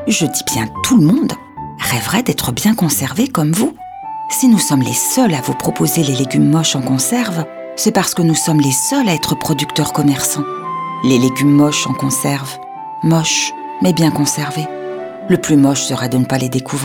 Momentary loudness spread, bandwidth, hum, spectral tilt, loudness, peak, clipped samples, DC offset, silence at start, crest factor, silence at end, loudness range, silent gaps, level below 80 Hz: 10 LU; 19.5 kHz; none; -4.5 dB/octave; -14 LUFS; 0 dBFS; under 0.1%; under 0.1%; 0 s; 14 dB; 0 s; 2 LU; none; -48 dBFS